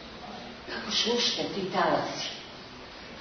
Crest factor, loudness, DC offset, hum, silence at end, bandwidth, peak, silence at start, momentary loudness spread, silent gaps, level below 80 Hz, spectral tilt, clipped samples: 18 dB; -28 LUFS; under 0.1%; none; 0 s; 6.6 kHz; -14 dBFS; 0 s; 18 LU; none; -60 dBFS; -3 dB/octave; under 0.1%